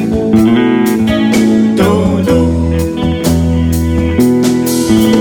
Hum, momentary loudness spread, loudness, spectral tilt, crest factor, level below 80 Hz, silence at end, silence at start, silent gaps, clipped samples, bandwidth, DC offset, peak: none; 4 LU; -11 LUFS; -6.5 dB/octave; 10 dB; -24 dBFS; 0 s; 0 s; none; under 0.1%; 18.5 kHz; 0.2%; 0 dBFS